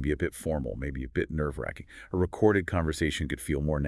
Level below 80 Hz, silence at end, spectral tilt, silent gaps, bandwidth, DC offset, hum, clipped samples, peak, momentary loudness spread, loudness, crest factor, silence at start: -42 dBFS; 0 s; -6.5 dB/octave; none; 12 kHz; under 0.1%; none; under 0.1%; -10 dBFS; 11 LU; -30 LUFS; 20 dB; 0 s